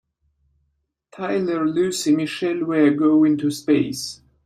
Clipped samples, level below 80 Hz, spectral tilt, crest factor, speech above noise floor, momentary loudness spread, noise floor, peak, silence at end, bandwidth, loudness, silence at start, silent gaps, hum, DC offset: under 0.1%; -64 dBFS; -5 dB/octave; 16 dB; 52 dB; 9 LU; -72 dBFS; -6 dBFS; 0.3 s; 15 kHz; -20 LUFS; 1.15 s; none; none; under 0.1%